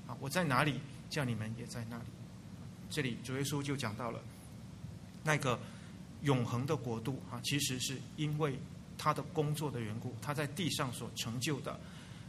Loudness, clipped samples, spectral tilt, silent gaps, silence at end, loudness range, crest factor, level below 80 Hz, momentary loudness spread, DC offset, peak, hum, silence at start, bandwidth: -37 LUFS; under 0.1%; -4.5 dB/octave; none; 0 s; 4 LU; 24 dB; -64 dBFS; 16 LU; under 0.1%; -14 dBFS; none; 0 s; 15.5 kHz